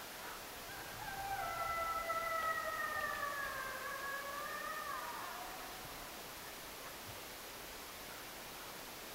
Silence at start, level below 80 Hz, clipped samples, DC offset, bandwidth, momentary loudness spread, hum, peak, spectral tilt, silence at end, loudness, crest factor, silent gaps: 0 s; -64 dBFS; under 0.1%; under 0.1%; 16 kHz; 10 LU; none; -26 dBFS; -1.5 dB/octave; 0 s; -43 LUFS; 18 dB; none